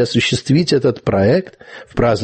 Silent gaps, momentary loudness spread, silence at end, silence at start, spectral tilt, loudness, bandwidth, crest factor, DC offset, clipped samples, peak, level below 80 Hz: none; 7 LU; 0 s; 0 s; -6 dB/octave; -16 LUFS; 8.8 kHz; 12 dB; under 0.1%; under 0.1%; -2 dBFS; -38 dBFS